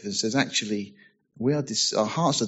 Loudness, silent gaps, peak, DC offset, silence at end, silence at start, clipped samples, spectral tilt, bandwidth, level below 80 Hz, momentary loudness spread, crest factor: -25 LUFS; none; -8 dBFS; under 0.1%; 0 s; 0 s; under 0.1%; -3.5 dB/octave; 8.2 kHz; -68 dBFS; 8 LU; 18 dB